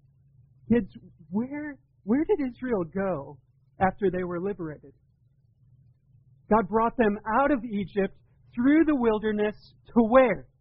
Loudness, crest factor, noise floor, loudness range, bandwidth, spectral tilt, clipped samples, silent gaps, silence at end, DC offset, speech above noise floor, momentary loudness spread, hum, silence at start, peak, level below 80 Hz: -26 LUFS; 20 dB; -64 dBFS; 7 LU; 5 kHz; -6.5 dB/octave; under 0.1%; none; 0.2 s; under 0.1%; 38 dB; 15 LU; none; 0.7 s; -6 dBFS; -50 dBFS